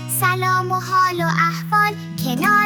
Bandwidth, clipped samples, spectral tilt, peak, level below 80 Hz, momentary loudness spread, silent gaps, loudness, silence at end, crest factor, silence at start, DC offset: 19.5 kHz; under 0.1%; -4.5 dB/octave; -4 dBFS; -58 dBFS; 3 LU; none; -18 LUFS; 0 s; 16 dB; 0 s; under 0.1%